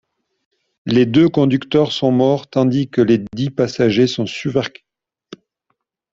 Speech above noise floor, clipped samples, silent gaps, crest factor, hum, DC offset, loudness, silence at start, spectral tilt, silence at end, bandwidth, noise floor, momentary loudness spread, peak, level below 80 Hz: 56 dB; under 0.1%; none; 16 dB; none; under 0.1%; -16 LUFS; 0.85 s; -7 dB/octave; 1.45 s; 7.6 kHz; -71 dBFS; 8 LU; -2 dBFS; -54 dBFS